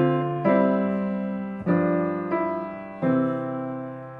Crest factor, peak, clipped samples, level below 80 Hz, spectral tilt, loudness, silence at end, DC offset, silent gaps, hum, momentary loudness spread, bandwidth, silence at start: 16 dB; -8 dBFS; under 0.1%; -62 dBFS; -10.5 dB/octave; -25 LUFS; 0 s; under 0.1%; none; none; 10 LU; 4.6 kHz; 0 s